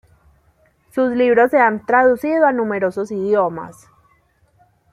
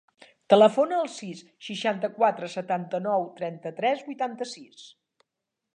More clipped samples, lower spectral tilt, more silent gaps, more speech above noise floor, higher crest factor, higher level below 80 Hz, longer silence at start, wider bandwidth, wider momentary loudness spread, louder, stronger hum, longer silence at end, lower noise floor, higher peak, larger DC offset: neither; first, -7 dB/octave vs -5 dB/octave; neither; second, 42 dB vs 59 dB; second, 16 dB vs 22 dB; first, -58 dBFS vs -82 dBFS; first, 0.95 s vs 0.5 s; first, 14 kHz vs 9.6 kHz; second, 9 LU vs 18 LU; first, -16 LUFS vs -26 LUFS; neither; first, 1.2 s vs 0.85 s; second, -58 dBFS vs -85 dBFS; about the same, -2 dBFS vs -4 dBFS; neither